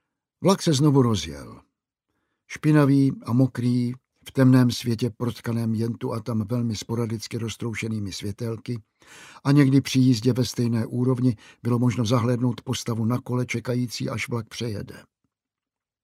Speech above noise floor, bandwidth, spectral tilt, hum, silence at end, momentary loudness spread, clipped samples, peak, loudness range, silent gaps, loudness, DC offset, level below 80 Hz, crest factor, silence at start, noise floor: 66 dB; 15 kHz; -6.5 dB/octave; none; 1 s; 12 LU; under 0.1%; -6 dBFS; 7 LU; none; -24 LUFS; under 0.1%; -58 dBFS; 18 dB; 0.4 s; -89 dBFS